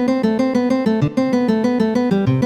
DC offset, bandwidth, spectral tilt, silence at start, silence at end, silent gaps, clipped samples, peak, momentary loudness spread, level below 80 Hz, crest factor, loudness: under 0.1%; 9.8 kHz; -8 dB/octave; 0 s; 0 s; none; under 0.1%; -6 dBFS; 1 LU; -48 dBFS; 12 dB; -17 LUFS